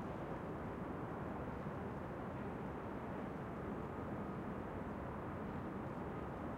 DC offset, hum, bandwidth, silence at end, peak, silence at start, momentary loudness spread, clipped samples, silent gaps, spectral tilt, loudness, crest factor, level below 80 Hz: under 0.1%; none; 16 kHz; 0 s; -32 dBFS; 0 s; 1 LU; under 0.1%; none; -8.5 dB/octave; -46 LUFS; 12 dB; -60 dBFS